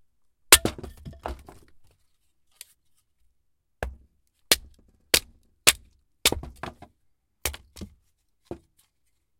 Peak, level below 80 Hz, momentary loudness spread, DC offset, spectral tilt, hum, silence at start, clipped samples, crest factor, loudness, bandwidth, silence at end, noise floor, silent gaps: 0 dBFS; -46 dBFS; 27 LU; under 0.1%; -0.5 dB/octave; none; 0.5 s; under 0.1%; 30 dB; -22 LUFS; 16.5 kHz; 0.85 s; -75 dBFS; none